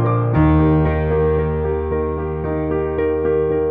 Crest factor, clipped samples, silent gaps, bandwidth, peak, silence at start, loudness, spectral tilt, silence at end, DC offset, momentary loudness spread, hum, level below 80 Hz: 14 dB; under 0.1%; none; 3.9 kHz; -4 dBFS; 0 s; -18 LUFS; -12 dB/octave; 0 s; under 0.1%; 7 LU; none; -26 dBFS